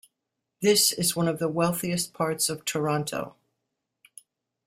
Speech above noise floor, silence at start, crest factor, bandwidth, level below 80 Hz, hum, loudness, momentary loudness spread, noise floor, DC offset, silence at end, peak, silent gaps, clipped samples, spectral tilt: 58 dB; 0.6 s; 20 dB; 16 kHz; -66 dBFS; none; -25 LUFS; 9 LU; -83 dBFS; under 0.1%; 1.35 s; -8 dBFS; none; under 0.1%; -3.5 dB/octave